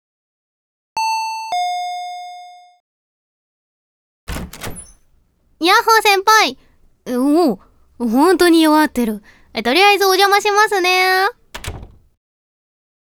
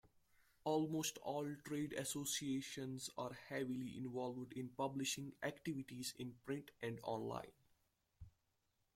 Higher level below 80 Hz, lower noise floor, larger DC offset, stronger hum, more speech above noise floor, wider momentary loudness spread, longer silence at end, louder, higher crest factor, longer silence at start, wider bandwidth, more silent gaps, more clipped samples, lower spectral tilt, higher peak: first, -44 dBFS vs -76 dBFS; second, -57 dBFS vs -84 dBFS; neither; neither; first, 43 dB vs 39 dB; first, 20 LU vs 8 LU; first, 1.3 s vs 0.65 s; first, -14 LUFS vs -45 LUFS; about the same, 16 dB vs 18 dB; first, 0.95 s vs 0.65 s; first, over 20 kHz vs 16.5 kHz; first, 2.80-4.27 s vs none; neither; second, -2.5 dB/octave vs -4 dB/octave; first, 0 dBFS vs -28 dBFS